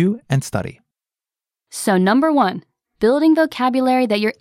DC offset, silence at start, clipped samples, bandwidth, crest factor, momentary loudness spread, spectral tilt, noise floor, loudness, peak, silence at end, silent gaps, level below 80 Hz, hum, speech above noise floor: under 0.1%; 0 s; under 0.1%; 15.5 kHz; 14 dB; 11 LU; -6 dB/octave; under -90 dBFS; -17 LUFS; -4 dBFS; 0.1 s; none; -54 dBFS; none; over 73 dB